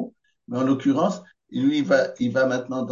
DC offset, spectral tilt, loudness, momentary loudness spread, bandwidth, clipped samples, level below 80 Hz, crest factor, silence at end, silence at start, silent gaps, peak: under 0.1%; -6.5 dB/octave; -23 LUFS; 13 LU; 7.4 kHz; under 0.1%; -68 dBFS; 16 dB; 0 s; 0 s; none; -6 dBFS